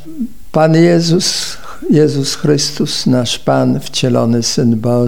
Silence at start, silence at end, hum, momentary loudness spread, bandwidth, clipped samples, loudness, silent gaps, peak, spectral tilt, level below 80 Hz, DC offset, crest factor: 0.05 s; 0 s; none; 9 LU; 17 kHz; under 0.1%; -13 LUFS; none; 0 dBFS; -5 dB/octave; -44 dBFS; 4%; 12 dB